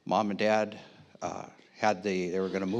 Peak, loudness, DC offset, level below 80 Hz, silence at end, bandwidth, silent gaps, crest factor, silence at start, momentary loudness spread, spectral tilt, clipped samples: -12 dBFS; -30 LUFS; under 0.1%; -80 dBFS; 0 s; 9.6 kHz; none; 20 dB; 0.05 s; 15 LU; -5.5 dB/octave; under 0.1%